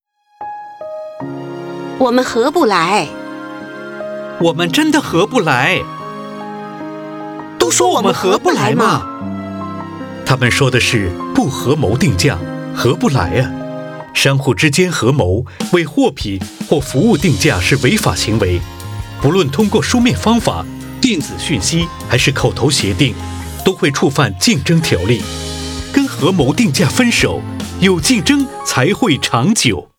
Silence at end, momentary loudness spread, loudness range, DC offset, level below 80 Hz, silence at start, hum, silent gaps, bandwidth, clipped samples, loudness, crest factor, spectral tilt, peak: 0.15 s; 15 LU; 2 LU; under 0.1%; -38 dBFS; 0.4 s; none; none; 19.5 kHz; under 0.1%; -14 LUFS; 14 dB; -4.5 dB/octave; 0 dBFS